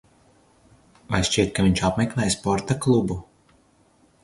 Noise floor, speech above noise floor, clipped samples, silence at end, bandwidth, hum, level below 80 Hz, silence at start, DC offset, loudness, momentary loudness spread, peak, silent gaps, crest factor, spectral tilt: -59 dBFS; 38 dB; under 0.1%; 1 s; 11.5 kHz; none; -42 dBFS; 1.1 s; under 0.1%; -22 LUFS; 6 LU; -2 dBFS; none; 22 dB; -5 dB/octave